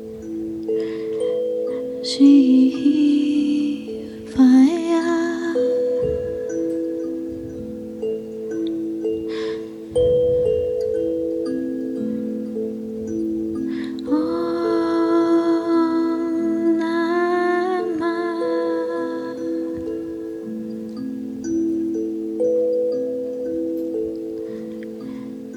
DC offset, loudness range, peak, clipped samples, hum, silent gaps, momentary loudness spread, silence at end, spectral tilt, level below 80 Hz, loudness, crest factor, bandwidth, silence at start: under 0.1%; 8 LU; -4 dBFS; under 0.1%; none; none; 13 LU; 0 s; -6 dB/octave; -52 dBFS; -21 LUFS; 16 dB; 11 kHz; 0 s